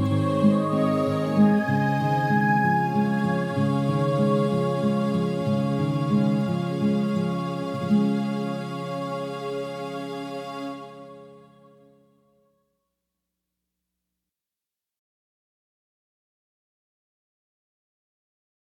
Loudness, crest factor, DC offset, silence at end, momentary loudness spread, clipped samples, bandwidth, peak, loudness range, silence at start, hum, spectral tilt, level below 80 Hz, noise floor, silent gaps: -24 LUFS; 18 dB; under 0.1%; 7.2 s; 12 LU; under 0.1%; 11.5 kHz; -8 dBFS; 14 LU; 0 s; none; -8 dB/octave; -70 dBFS; -88 dBFS; none